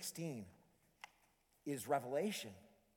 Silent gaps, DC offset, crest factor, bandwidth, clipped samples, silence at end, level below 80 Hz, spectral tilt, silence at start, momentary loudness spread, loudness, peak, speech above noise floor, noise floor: none; under 0.1%; 20 dB; 19 kHz; under 0.1%; 0.3 s; -84 dBFS; -4.5 dB/octave; 0 s; 20 LU; -44 LUFS; -24 dBFS; 33 dB; -76 dBFS